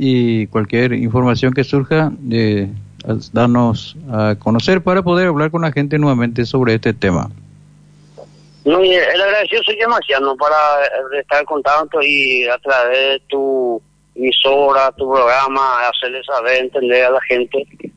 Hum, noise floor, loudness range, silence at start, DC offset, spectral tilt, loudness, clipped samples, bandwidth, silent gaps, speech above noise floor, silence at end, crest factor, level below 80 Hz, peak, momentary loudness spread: none; -45 dBFS; 3 LU; 0 s; under 0.1%; -6.5 dB/octave; -14 LUFS; under 0.1%; 9 kHz; none; 30 dB; 0.1 s; 12 dB; -46 dBFS; -2 dBFS; 8 LU